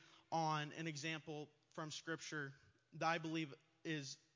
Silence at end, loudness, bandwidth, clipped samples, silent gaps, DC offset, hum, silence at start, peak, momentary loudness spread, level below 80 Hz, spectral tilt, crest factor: 0.2 s; -46 LUFS; 7.6 kHz; under 0.1%; none; under 0.1%; none; 0 s; -26 dBFS; 12 LU; under -90 dBFS; -4.5 dB/octave; 20 dB